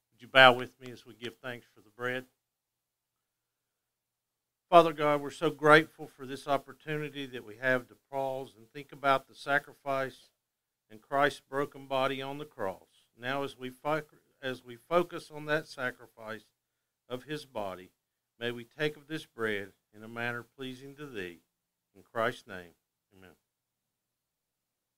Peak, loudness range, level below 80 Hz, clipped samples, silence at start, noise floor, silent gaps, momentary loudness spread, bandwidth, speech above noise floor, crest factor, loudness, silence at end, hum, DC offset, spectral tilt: -4 dBFS; 13 LU; -72 dBFS; under 0.1%; 0.2 s; -87 dBFS; none; 21 LU; 16 kHz; 56 dB; 30 dB; -31 LUFS; 1.7 s; none; under 0.1%; -5 dB/octave